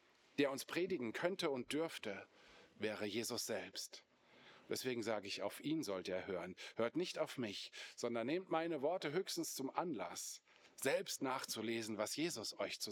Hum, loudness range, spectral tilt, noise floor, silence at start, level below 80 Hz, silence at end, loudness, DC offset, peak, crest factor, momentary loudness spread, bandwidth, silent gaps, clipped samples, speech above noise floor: none; 3 LU; -3.5 dB/octave; -66 dBFS; 0.35 s; under -90 dBFS; 0 s; -43 LUFS; under 0.1%; -22 dBFS; 22 dB; 8 LU; over 20 kHz; none; under 0.1%; 23 dB